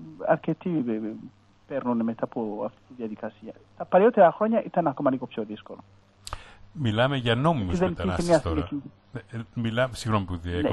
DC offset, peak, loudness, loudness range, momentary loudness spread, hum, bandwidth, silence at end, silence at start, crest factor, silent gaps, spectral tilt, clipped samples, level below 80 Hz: under 0.1%; -6 dBFS; -26 LUFS; 5 LU; 20 LU; none; 12 kHz; 0 s; 0 s; 20 dB; none; -6.5 dB/octave; under 0.1%; -48 dBFS